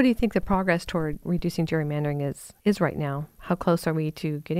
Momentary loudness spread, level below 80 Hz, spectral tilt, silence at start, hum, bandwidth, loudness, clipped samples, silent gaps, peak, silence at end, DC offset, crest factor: 7 LU; -44 dBFS; -7 dB/octave; 0 s; none; 16 kHz; -26 LUFS; under 0.1%; none; -8 dBFS; 0 s; under 0.1%; 18 dB